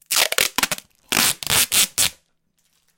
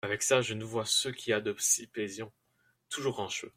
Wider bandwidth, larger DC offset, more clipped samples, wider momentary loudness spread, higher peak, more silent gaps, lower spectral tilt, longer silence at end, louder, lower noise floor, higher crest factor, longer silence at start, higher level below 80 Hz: first, over 20 kHz vs 16.5 kHz; neither; neither; second, 7 LU vs 11 LU; first, -2 dBFS vs -12 dBFS; neither; second, 0.5 dB/octave vs -2 dB/octave; first, 0.85 s vs 0.05 s; first, -18 LUFS vs -31 LUFS; second, -67 dBFS vs -73 dBFS; about the same, 20 dB vs 22 dB; about the same, 0.1 s vs 0.05 s; first, -52 dBFS vs -72 dBFS